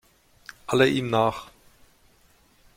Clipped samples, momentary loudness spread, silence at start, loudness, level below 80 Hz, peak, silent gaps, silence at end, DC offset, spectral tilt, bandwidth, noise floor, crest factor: under 0.1%; 21 LU; 0.7 s; -23 LUFS; -58 dBFS; -6 dBFS; none; 1.3 s; under 0.1%; -5.5 dB/octave; 16 kHz; -60 dBFS; 22 dB